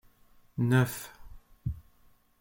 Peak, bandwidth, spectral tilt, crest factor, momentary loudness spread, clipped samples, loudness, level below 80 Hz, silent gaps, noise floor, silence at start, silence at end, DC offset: -12 dBFS; 17 kHz; -6.5 dB/octave; 22 dB; 20 LU; under 0.1%; -30 LUFS; -52 dBFS; none; -62 dBFS; 0.55 s; 0.6 s; under 0.1%